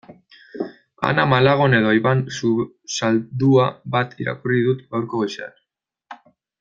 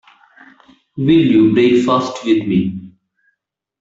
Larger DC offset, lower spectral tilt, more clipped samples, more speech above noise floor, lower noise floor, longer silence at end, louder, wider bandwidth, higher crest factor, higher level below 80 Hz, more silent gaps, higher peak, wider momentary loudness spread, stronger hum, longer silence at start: neither; about the same, -6 dB/octave vs -7 dB/octave; neither; about the same, 60 dB vs 61 dB; about the same, -78 dBFS vs -75 dBFS; second, 0.45 s vs 0.95 s; second, -19 LUFS vs -14 LUFS; about the same, 7.6 kHz vs 7.8 kHz; first, 20 dB vs 14 dB; about the same, -58 dBFS vs -54 dBFS; neither; about the same, 0 dBFS vs -2 dBFS; first, 15 LU vs 12 LU; neither; second, 0.1 s vs 0.95 s